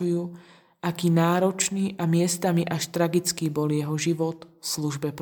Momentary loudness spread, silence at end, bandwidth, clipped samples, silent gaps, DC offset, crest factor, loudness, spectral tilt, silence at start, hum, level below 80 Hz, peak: 8 LU; 0 s; 19 kHz; under 0.1%; none; under 0.1%; 16 dB; -25 LUFS; -5 dB/octave; 0 s; none; -68 dBFS; -10 dBFS